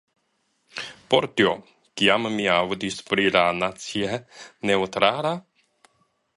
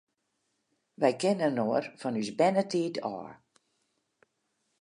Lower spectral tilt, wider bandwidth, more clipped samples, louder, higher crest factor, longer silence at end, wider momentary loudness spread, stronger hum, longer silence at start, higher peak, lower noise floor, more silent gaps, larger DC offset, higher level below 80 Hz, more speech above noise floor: second, -4 dB/octave vs -5.5 dB/octave; about the same, 11.5 kHz vs 11.5 kHz; neither; first, -23 LUFS vs -29 LUFS; about the same, 24 dB vs 22 dB; second, 0.95 s vs 1.45 s; first, 15 LU vs 11 LU; neither; second, 0.75 s vs 1 s; first, -2 dBFS vs -10 dBFS; second, -71 dBFS vs -79 dBFS; neither; neither; first, -60 dBFS vs -80 dBFS; about the same, 48 dB vs 50 dB